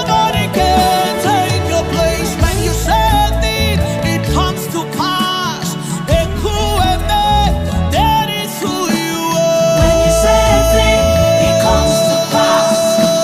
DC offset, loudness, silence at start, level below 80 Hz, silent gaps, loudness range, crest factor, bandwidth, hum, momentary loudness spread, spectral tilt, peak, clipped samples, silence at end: 0.1%; -13 LUFS; 0 s; -22 dBFS; none; 4 LU; 12 dB; 15.5 kHz; none; 6 LU; -4.5 dB/octave; 0 dBFS; under 0.1%; 0 s